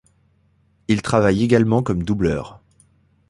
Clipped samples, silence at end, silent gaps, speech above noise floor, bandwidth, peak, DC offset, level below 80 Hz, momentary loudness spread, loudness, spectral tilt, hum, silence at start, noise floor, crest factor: under 0.1%; 0.75 s; none; 42 dB; 11.5 kHz; -2 dBFS; under 0.1%; -42 dBFS; 13 LU; -19 LUFS; -7 dB/octave; none; 0.9 s; -60 dBFS; 18 dB